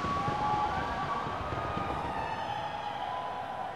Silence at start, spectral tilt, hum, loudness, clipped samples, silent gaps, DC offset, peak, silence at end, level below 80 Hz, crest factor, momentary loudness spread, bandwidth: 0 s; -5.5 dB/octave; none; -34 LUFS; under 0.1%; none; 0.1%; -18 dBFS; 0 s; -50 dBFS; 14 dB; 6 LU; 13 kHz